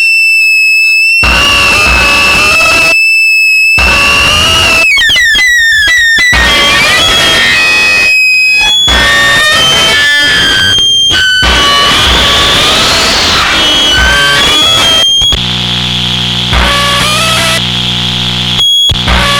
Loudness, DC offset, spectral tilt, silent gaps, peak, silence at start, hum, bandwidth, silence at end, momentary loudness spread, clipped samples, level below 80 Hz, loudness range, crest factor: -4 LUFS; under 0.1%; -1.5 dB/octave; none; 0 dBFS; 0 s; none; 19.5 kHz; 0 s; 4 LU; under 0.1%; -22 dBFS; 3 LU; 6 dB